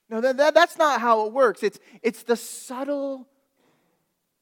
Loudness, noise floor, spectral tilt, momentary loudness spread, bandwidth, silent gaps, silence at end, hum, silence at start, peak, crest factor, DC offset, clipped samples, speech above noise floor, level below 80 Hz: -22 LUFS; -73 dBFS; -3 dB/octave; 14 LU; 18.5 kHz; none; 1.2 s; none; 0.1 s; -4 dBFS; 20 dB; under 0.1%; under 0.1%; 51 dB; -74 dBFS